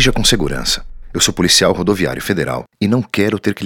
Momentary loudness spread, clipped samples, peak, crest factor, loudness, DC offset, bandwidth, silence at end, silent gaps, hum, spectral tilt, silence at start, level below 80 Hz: 9 LU; under 0.1%; 0 dBFS; 16 dB; -15 LUFS; under 0.1%; 18.5 kHz; 0 s; none; none; -3.5 dB/octave; 0 s; -28 dBFS